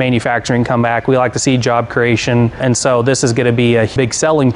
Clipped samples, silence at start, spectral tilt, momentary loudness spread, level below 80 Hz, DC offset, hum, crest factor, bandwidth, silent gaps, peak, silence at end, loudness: under 0.1%; 0 s; -5 dB/octave; 2 LU; -42 dBFS; under 0.1%; none; 12 dB; 11 kHz; none; 0 dBFS; 0 s; -13 LUFS